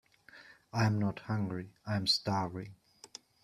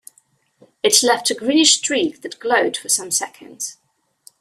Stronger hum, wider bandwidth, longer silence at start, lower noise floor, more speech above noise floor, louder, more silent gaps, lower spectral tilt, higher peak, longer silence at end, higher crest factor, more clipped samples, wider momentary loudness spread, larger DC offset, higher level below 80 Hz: neither; second, 13.5 kHz vs 16 kHz; second, 0.35 s vs 0.85 s; about the same, -58 dBFS vs -60 dBFS; second, 24 dB vs 41 dB; second, -33 LUFS vs -16 LUFS; neither; first, -5 dB/octave vs -0.5 dB/octave; second, -14 dBFS vs 0 dBFS; second, 0.4 s vs 0.7 s; about the same, 22 dB vs 20 dB; neither; first, 21 LU vs 16 LU; neither; about the same, -66 dBFS vs -68 dBFS